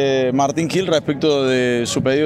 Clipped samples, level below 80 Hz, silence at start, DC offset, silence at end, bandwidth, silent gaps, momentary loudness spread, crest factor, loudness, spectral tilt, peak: under 0.1%; -52 dBFS; 0 s; under 0.1%; 0 s; 14 kHz; none; 2 LU; 14 dB; -18 LUFS; -5 dB/octave; -4 dBFS